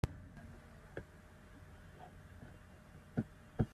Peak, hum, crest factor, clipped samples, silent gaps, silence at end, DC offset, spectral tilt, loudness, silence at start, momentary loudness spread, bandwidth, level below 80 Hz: -18 dBFS; none; 28 dB; under 0.1%; none; 0 s; under 0.1%; -8 dB/octave; -50 LUFS; 0.05 s; 15 LU; 14 kHz; -56 dBFS